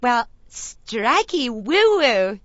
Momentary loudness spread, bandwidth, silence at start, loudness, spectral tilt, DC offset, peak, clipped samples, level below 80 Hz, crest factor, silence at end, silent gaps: 18 LU; 8 kHz; 0 s; -19 LUFS; -2.5 dB/octave; under 0.1%; -4 dBFS; under 0.1%; -52 dBFS; 16 dB; 0.05 s; none